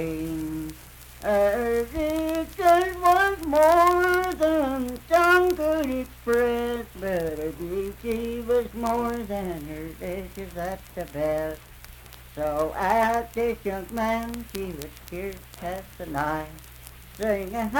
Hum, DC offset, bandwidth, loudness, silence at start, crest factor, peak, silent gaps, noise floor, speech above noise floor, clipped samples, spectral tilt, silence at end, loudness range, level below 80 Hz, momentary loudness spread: none; under 0.1%; 19 kHz; -25 LUFS; 0 s; 18 dB; -8 dBFS; none; -45 dBFS; 19 dB; under 0.1%; -5 dB/octave; 0 s; 11 LU; -44 dBFS; 17 LU